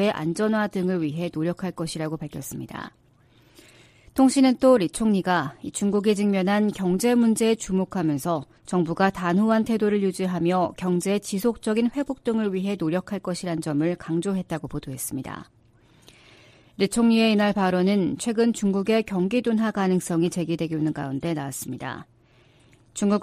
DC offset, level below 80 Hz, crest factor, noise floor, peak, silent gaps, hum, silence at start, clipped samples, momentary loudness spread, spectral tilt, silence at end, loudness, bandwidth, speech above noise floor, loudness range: under 0.1%; -56 dBFS; 18 dB; -57 dBFS; -6 dBFS; none; none; 0 s; under 0.1%; 12 LU; -6 dB/octave; 0 s; -24 LUFS; 15 kHz; 34 dB; 7 LU